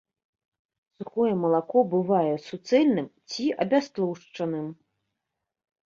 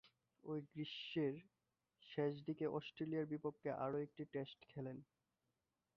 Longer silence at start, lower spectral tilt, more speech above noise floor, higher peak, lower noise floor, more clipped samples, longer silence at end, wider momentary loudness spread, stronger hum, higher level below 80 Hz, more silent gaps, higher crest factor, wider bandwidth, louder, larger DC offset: first, 1 s vs 0.05 s; about the same, -6.5 dB/octave vs -5.5 dB/octave; first, 60 dB vs 44 dB; first, -10 dBFS vs -28 dBFS; second, -85 dBFS vs -90 dBFS; neither; first, 1.15 s vs 0.95 s; first, 12 LU vs 9 LU; neither; first, -72 dBFS vs -84 dBFS; neither; about the same, 18 dB vs 18 dB; first, 7.4 kHz vs 6.6 kHz; first, -26 LUFS vs -46 LUFS; neither